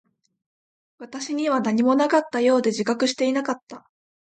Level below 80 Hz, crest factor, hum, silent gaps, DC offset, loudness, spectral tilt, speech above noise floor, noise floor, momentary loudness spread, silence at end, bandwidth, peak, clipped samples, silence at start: -74 dBFS; 16 dB; none; 3.63-3.67 s; under 0.1%; -22 LUFS; -4 dB/octave; over 68 dB; under -90 dBFS; 11 LU; 0.45 s; 9.2 kHz; -8 dBFS; under 0.1%; 1 s